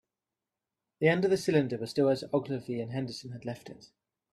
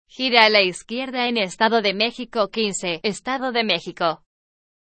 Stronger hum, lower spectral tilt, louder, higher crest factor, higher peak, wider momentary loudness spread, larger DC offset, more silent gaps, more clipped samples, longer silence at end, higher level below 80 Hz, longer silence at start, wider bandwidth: neither; first, -6.5 dB/octave vs -3 dB/octave; second, -30 LUFS vs -20 LUFS; about the same, 20 dB vs 22 dB; second, -10 dBFS vs 0 dBFS; first, 14 LU vs 10 LU; neither; neither; neither; second, 0.5 s vs 0.75 s; second, -70 dBFS vs -62 dBFS; first, 1 s vs 0.2 s; first, 13.5 kHz vs 11 kHz